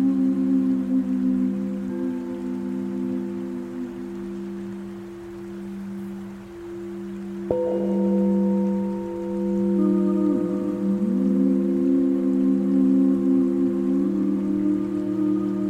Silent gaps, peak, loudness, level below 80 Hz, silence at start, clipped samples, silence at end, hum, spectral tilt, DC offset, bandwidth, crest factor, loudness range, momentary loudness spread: none; -6 dBFS; -23 LUFS; -56 dBFS; 0 s; under 0.1%; 0 s; none; -9.5 dB/octave; under 0.1%; 8.4 kHz; 16 dB; 12 LU; 14 LU